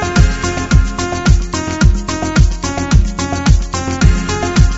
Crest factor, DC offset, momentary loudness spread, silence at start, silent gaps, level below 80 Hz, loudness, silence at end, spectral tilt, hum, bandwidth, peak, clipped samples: 12 dB; under 0.1%; 5 LU; 0 s; none; -14 dBFS; -15 LUFS; 0 s; -5.5 dB/octave; none; 8 kHz; 0 dBFS; 0.4%